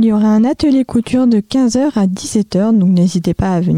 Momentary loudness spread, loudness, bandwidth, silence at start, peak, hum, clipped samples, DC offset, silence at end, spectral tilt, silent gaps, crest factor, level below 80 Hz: 4 LU; -13 LUFS; 11.5 kHz; 0 s; -4 dBFS; none; under 0.1%; 0.3%; 0 s; -7 dB/octave; none; 8 dB; -38 dBFS